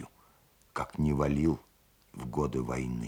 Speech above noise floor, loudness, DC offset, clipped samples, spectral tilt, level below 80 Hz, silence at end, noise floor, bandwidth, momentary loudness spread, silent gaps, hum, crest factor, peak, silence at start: 34 dB; -32 LUFS; under 0.1%; under 0.1%; -8 dB/octave; -46 dBFS; 0 s; -64 dBFS; 17.5 kHz; 16 LU; none; none; 18 dB; -14 dBFS; 0 s